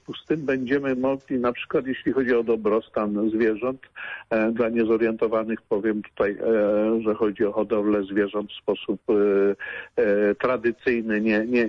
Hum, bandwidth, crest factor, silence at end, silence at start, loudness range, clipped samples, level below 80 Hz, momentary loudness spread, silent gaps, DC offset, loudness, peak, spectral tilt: none; 6.4 kHz; 12 dB; 0 s; 0.1 s; 1 LU; under 0.1%; -58 dBFS; 7 LU; none; under 0.1%; -24 LUFS; -12 dBFS; -8 dB/octave